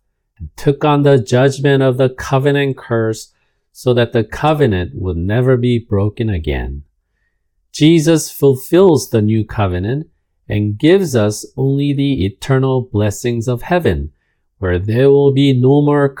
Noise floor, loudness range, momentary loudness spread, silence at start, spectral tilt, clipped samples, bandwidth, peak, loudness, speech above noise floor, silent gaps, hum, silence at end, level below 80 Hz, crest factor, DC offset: -65 dBFS; 3 LU; 10 LU; 0.4 s; -6.5 dB/octave; under 0.1%; 18 kHz; 0 dBFS; -14 LUFS; 52 dB; none; none; 0 s; -36 dBFS; 14 dB; under 0.1%